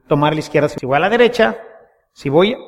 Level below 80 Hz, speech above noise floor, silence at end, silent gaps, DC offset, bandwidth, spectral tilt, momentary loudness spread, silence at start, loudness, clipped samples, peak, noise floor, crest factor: -48 dBFS; 31 dB; 0.05 s; none; under 0.1%; 13 kHz; -6 dB/octave; 6 LU; 0.1 s; -15 LUFS; under 0.1%; 0 dBFS; -46 dBFS; 16 dB